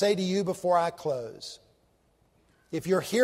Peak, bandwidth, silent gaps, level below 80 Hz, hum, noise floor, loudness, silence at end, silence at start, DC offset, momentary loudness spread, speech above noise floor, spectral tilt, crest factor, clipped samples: -12 dBFS; 16 kHz; none; -68 dBFS; none; -67 dBFS; -29 LUFS; 0 s; 0 s; under 0.1%; 16 LU; 40 dB; -5 dB/octave; 18 dB; under 0.1%